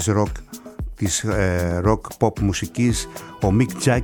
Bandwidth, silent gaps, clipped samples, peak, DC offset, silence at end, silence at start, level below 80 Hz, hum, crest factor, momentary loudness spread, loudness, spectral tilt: 19 kHz; none; under 0.1%; -4 dBFS; under 0.1%; 0 s; 0 s; -34 dBFS; none; 18 dB; 14 LU; -21 LUFS; -5.5 dB/octave